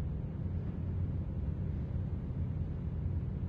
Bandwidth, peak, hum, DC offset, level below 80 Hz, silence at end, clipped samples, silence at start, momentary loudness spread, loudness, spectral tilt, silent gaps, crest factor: 3.8 kHz; -24 dBFS; none; under 0.1%; -42 dBFS; 0 s; under 0.1%; 0 s; 1 LU; -38 LUFS; -11.5 dB/octave; none; 12 dB